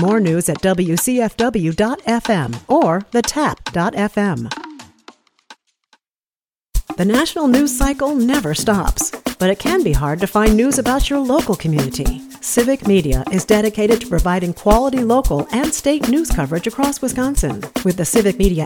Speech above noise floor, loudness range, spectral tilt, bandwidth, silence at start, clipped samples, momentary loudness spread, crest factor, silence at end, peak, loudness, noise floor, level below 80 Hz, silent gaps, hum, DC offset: over 74 dB; 5 LU; -5 dB/octave; 19.5 kHz; 0 s; under 0.1%; 6 LU; 16 dB; 0 s; 0 dBFS; -17 LUFS; under -90 dBFS; -28 dBFS; 6.17-6.21 s, 6.36-6.40 s; none; under 0.1%